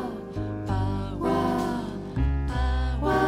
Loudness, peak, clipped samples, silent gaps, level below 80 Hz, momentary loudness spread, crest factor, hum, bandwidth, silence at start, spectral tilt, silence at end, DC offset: -28 LUFS; -12 dBFS; under 0.1%; none; -30 dBFS; 7 LU; 14 dB; none; 13 kHz; 0 s; -7.5 dB/octave; 0 s; under 0.1%